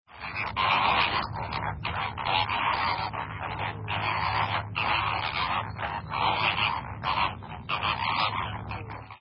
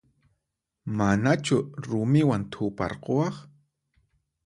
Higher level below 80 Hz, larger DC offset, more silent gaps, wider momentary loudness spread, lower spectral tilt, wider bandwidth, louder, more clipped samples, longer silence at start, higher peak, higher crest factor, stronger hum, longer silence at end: first, -48 dBFS vs -54 dBFS; neither; neither; about the same, 9 LU vs 10 LU; first, -8 dB/octave vs -6.5 dB/octave; second, 5.8 kHz vs 11.5 kHz; about the same, -28 LUFS vs -26 LUFS; neither; second, 0.1 s vs 0.85 s; about the same, -10 dBFS vs -8 dBFS; about the same, 18 dB vs 20 dB; neither; second, 0.05 s vs 1 s